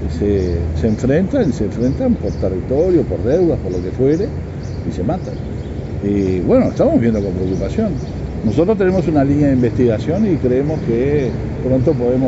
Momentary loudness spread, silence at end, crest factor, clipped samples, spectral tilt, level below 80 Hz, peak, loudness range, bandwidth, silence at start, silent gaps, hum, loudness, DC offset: 9 LU; 0 s; 14 dB; under 0.1%; -9 dB/octave; -30 dBFS; -2 dBFS; 3 LU; 8 kHz; 0 s; none; none; -17 LUFS; under 0.1%